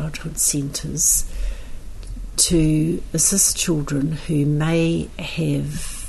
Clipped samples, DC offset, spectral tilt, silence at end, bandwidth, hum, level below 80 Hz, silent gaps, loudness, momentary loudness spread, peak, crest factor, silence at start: under 0.1%; under 0.1%; -4 dB/octave; 0 s; 12.5 kHz; none; -32 dBFS; none; -19 LUFS; 16 LU; -4 dBFS; 18 dB; 0 s